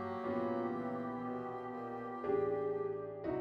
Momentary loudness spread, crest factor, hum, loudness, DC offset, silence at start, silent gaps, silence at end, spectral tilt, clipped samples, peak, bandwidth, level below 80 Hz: 8 LU; 14 dB; none; -39 LUFS; under 0.1%; 0 s; none; 0 s; -9 dB/octave; under 0.1%; -24 dBFS; 5.6 kHz; -70 dBFS